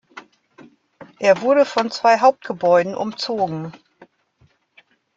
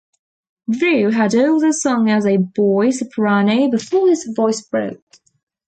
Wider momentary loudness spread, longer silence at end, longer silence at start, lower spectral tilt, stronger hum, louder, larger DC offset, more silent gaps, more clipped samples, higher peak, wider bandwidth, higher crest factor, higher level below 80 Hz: first, 10 LU vs 7 LU; first, 1.4 s vs 0.7 s; second, 0.15 s vs 0.7 s; about the same, -5 dB/octave vs -5.5 dB/octave; neither; about the same, -18 LUFS vs -16 LUFS; neither; neither; neither; first, -2 dBFS vs -6 dBFS; second, 7.8 kHz vs 9.2 kHz; first, 18 dB vs 10 dB; second, -68 dBFS vs -62 dBFS